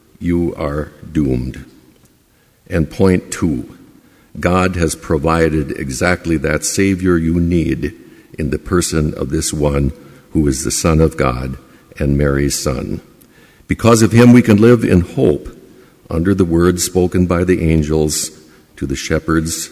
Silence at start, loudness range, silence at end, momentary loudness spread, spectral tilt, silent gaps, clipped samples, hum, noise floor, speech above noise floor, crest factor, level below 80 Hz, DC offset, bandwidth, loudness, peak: 0.2 s; 7 LU; 0.05 s; 13 LU; -5.5 dB/octave; none; under 0.1%; none; -53 dBFS; 39 dB; 16 dB; -28 dBFS; under 0.1%; 16 kHz; -15 LUFS; 0 dBFS